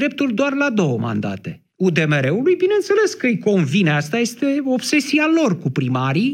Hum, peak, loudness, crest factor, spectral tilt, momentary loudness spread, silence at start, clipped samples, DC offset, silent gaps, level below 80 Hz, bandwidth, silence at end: none; -2 dBFS; -18 LUFS; 16 dB; -6 dB/octave; 5 LU; 0 s; under 0.1%; under 0.1%; none; -68 dBFS; 16 kHz; 0 s